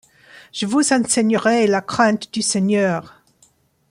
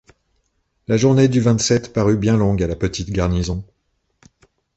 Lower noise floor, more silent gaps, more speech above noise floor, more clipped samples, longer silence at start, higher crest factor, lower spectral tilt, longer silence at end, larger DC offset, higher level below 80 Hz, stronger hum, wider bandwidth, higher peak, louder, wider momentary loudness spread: second, -58 dBFS vs -67 dBFS; neither; second, 40 dB vs 51 dB; neither; second, 0.55 s vs 0.9 s; about the same, 18 dB vs 16 dB; second, -4 dB/octave vs -6 dB/octave; second, 0.8 s vs 1.15 s; neither; second, -62 dBFS vs -36 dBFS; neither; first, 15 kHz vs 8.2 kHz; about the same, -2 dBFS vs -2 dBFS; about the same, -18 LUFS vs -18 LUFS; about the same, 7 LU vs 9 LU